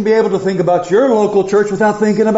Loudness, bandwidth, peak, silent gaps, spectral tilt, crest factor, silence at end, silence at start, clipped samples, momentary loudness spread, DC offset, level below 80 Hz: -13 LUFS; 8 kHz; -2 dBFS; none; -6 dB/octave; 10 dB; 0 s; 0 s; under 0.1%; 3 LU; under 0.1%; -52 dBFS